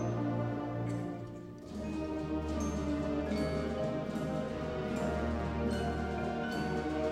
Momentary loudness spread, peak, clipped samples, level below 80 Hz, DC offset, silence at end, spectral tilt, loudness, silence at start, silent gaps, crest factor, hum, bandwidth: 5 LU; -22 dBFS; under 0.1%; -46 dBFS; under 0.1%; 0 s; -7 dB/octave; -36 LUFS; 0 s; none; 12 dB; none; 14 kHz